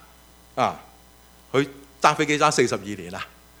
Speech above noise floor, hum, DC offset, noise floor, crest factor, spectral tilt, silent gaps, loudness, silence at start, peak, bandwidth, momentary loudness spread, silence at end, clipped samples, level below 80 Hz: 29 dB; none; under 0.1%; -52 dBFS; 26 dB; -4 dB/octave; none; -23 LUFS; 0.55 s; 0 dBFS; over 20 kHz; 16 LU; 0.35 s; under 0.1%; -56 dBFS